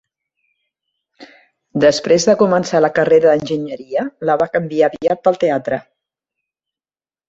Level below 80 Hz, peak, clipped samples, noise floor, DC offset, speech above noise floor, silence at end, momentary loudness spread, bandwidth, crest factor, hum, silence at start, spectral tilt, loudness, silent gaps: -56 dBFS; -2 dBFS; under 0.1%; under -90 dBFS; under 0.1%; over 75 dB; 1.5 s; 10 LU; 8 kHz; 16 dB; none; 1.2 s; -5 dB/octave; -15 LUFS; none